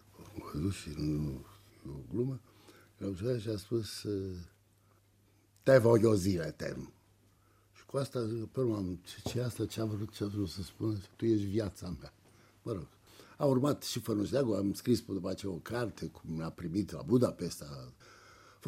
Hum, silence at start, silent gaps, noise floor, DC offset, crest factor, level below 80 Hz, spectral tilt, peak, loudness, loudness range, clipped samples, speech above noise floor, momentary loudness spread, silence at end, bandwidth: none; 0.2 s; none; -67 dBFS; under 0.1%; 24 dB; -58 dBFS; -6.5 dB/octave; -10 dBFS; -34 LUFS; 7 LU; under 0.1%; 34 dB; 17 LU; 0 s; 16 kHz